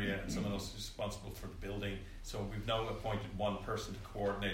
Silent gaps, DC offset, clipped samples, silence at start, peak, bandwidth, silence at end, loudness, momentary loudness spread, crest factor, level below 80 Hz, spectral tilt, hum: none; under 0.1%; under 0.1%; 0 s; -24 dBFS; 16 kHz; 0 s; -41 LUFS; 8 LU; 16 dB; -50 dBFS; -5 dB/octave; none